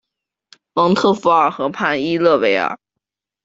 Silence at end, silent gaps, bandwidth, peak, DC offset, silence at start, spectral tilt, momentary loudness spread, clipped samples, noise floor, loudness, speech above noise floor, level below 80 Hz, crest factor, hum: 0.7 s; none; 7.8 kHz; -2 dBFS; under 0.1%; 0.75 s; -6 dB/octave; 9 LU; under 0.1%; -81 dBFS; -16 LUFS; 66 dB; -60 dBFS; 16 dB; none